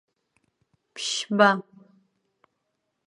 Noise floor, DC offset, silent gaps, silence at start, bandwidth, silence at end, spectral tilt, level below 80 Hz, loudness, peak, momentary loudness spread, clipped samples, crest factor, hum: -78 dBFS; under 0.1%; none; 0.95 s; 11.5 kHz; 1.45 s; -3.5 dB/octave; -84 dBFS; -23 LUFS; -4 dBFS; 14 LU; under 0.1%; 24 dB; none